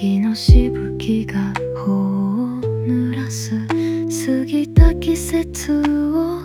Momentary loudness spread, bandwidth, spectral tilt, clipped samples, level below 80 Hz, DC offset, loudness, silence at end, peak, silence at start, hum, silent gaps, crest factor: 9 LU; 16 kHz; -6.5 dB/octave; under 0.1%; -22 dBFS; under 0.1%; -18 LUFS; 0 s; 0 dBFS; 0 s; none; none; 16 dB